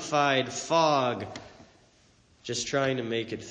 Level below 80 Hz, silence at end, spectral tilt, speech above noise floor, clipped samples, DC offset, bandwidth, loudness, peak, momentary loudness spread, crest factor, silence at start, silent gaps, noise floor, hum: -66 dBFS; 0 s; -4 dB/octave; 34 dB; under 0.1%; under 0.1%; 9.8 kHz; -27 LUFS; -10 dBFS; 15 LU; 18 dB; 0 s; none; -62 dBFS; none